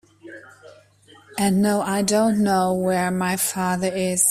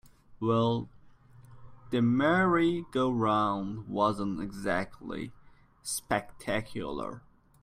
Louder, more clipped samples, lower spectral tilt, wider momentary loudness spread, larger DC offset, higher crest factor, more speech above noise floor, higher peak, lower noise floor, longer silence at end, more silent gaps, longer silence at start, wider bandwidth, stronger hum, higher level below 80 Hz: first, -21 LUFS vs -30 LUFS; neither; about the same, -4.5 dB/octave vs -5.5 dB/octave; second, 5 LU vs 15 LU; neither; about the same, 18 dB vs 18 dB; first, 31 dB vs 25 dB; first, -4 dBFS vs -14 dBFS; about the same, -52 dBFS vs -55 dBFS; second, 0 s vs 0.45 s; neither; about the same, 0.25 s vs 0.3 s; about the same, 16 kHz vs 15.5 kHz; neither; about the same, -58 dBFS vs -58 dBFS